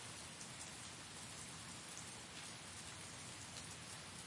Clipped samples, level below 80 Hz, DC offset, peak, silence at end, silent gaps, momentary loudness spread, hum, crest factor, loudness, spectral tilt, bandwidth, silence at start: under 0.1%; -74 dBFS; under 0.1%; -34 dBFS; 0 s; none; 1 LU; none; 18 dB; -50 LUFS; -2 dB/octave; 11.5 kHz; 0 s